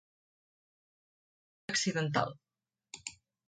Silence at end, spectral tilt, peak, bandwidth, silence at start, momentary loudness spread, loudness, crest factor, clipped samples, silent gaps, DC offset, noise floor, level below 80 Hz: 0.35 s; -3.5 dB/octave; -14 dBFS; 9.4 kHz; 1.7 s; 17 LU; -33 LUFS; 24 dB; under 0.1%; none; under 0.1%; -62 dBFS; -74 dBFS